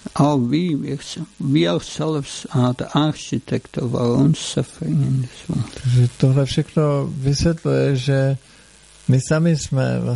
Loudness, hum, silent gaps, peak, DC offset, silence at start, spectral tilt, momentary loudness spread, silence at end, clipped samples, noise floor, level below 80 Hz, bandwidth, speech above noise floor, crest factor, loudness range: -20 LUFS; none; none; -2 dBFS; under 0.1%; 0.05 s; -6.5 dB/octave; 9 LU; 0 s; under 0.1%; -47 dBFS; -44 dBFS; 11.5 kHz; 29 dB; 16 dB; 2 LU